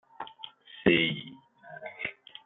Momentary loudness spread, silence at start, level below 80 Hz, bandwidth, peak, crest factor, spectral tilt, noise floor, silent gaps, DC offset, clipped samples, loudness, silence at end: 23 LU; 0.2 s; -64 dBFS; 4.1 kHz; -10 dBFS; 22 dB; -9 dB/octave; -50 dBFS; none; under 0.1%; under 0.1%; -28 LUFS; 0.35 s